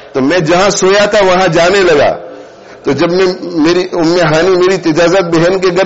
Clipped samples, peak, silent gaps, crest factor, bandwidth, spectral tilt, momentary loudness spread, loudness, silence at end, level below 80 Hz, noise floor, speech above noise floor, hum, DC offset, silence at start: under 0.1%; -2 dBFS; none; 8 dB; 8 kHz; -4.5 dB/octave; 5 LU; -9 LUFS; 0 s; -40 dBFS; -32 dBFS; 23 dB; none; under 0.1%; 0 s